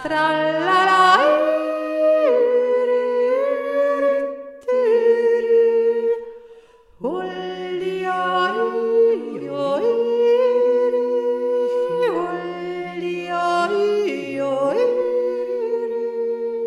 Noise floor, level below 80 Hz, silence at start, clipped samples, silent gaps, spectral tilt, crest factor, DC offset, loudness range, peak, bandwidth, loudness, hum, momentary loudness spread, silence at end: -47 dBFS; -64 dBFS; 0 s; under 0.1%; none; -5 dB/octave; 16 dB; under 0.1%; 5 LU; -2 dBFS; 11 kHz; -19 LUFS; none; 10 LU; 0 s